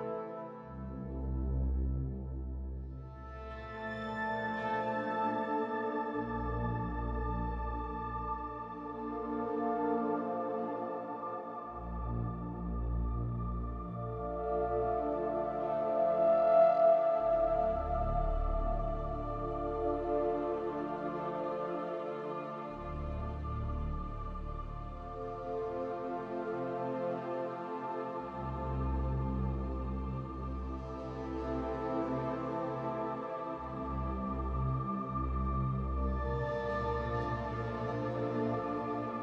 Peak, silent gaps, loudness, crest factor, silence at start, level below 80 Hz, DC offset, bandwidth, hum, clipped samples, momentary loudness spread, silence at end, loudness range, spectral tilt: -16 dBFS; none; -36 LUFS; 18 dB; 0 s; -42 dBFS; under 0.1%; 6.2 kHz; none; under 0.1%; 9 LU; 0 s; 10 LU; -9.5 dB/octave